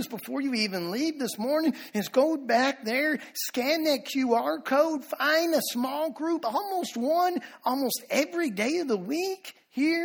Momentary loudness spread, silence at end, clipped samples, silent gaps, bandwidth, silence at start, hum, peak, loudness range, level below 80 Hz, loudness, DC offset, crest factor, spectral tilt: 6 LU; 0 s; under 0.1%; none; over 20 kHz; 0 s; none; -10 dBFS; 2 LU; -76 dBFS; -27 LUFS; under 0.1%; 18 dB; -3.5 dB/octave